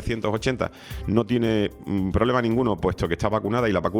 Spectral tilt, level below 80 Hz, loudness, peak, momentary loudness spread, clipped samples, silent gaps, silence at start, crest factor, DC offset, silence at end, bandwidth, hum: -7 dB/octave; -42 dBFS; -24 LUFS; -6 dBFS; 5 LU; under 0.1%; none; 0 s; 18 dB; under 0.1%; 0 s; 17 kHz; none